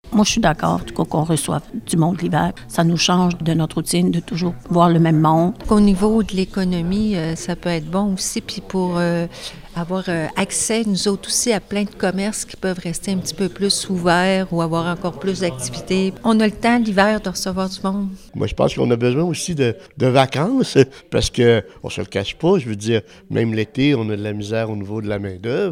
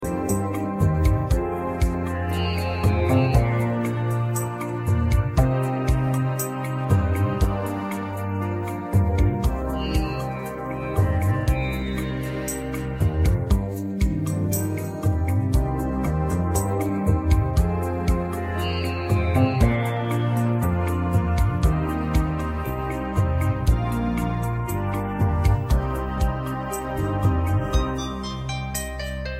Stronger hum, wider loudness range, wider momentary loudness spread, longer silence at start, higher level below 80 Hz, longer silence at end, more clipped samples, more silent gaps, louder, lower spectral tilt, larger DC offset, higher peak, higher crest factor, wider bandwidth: neither; about the same, 4 LU vs 2 LU; about the same, 9 LU vs 7 LU; about the same, 0.05 s vs 0 s; second, -40 dBFS vs -28 dBFS; about the same, 0 s vs 0 s; neither; neither; first, -19 LUFS vs -24 LUFS; second, -5 dB/octave vs -6.5 dB/octave; neither; first, 0 dBFS vs -6 dBFS; about the same, 18 dB vs 16 dB; about the same, 16 kHz vs 15.5 kHz